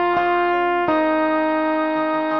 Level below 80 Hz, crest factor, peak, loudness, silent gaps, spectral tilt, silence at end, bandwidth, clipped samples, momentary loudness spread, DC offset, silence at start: -56 dBFS; 12 dB; -6 dBFS; -19 LUFS; none; -7 dB/octave; 0 s; 5.8 kHz; under 0.1%; 2 LU; 0.3%; 0 s